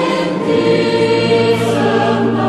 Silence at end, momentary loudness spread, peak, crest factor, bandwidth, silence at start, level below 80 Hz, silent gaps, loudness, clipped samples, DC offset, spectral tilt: 0 s; 3 LU; -2 dBFS; 10 dB; 12.5 kHz; 0 s; -50 dBFS; none; -13 LUFS; under 0.1%; under 0.1%; -6 dB/octave